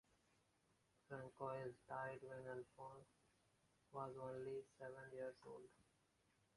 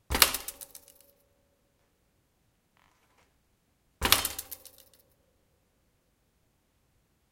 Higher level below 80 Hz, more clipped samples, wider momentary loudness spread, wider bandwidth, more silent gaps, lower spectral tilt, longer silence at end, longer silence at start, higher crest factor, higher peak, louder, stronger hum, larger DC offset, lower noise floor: second, -86 dBFS vs -50 dBFS; neither; second, 10 LU vs 23 LU; second, 11 kHz vs 17 kHz; neither; first, -7 dB/octave vs -1 dB/octave; second, 0.75 s vs 2.75 s; first, 1.1 s vs 0.1 s; second, 20 dB vs 36 dB; second, -36 dBFS vs 0 dBFS; second, -54 LUFS vs -26 LUFS; neither; neither; first, -82 dBFS vs -72 dBFS